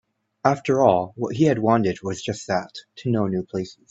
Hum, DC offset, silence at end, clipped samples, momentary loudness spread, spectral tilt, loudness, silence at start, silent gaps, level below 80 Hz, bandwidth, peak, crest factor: none; under 0.1%; 0.2 s; under 0.1%; 12 LU; -6.5 dB/octave; -22 LUFS; 0.45 s; none; -60 dBFS; 8.2 kHz; -2 dBFS; 22 dB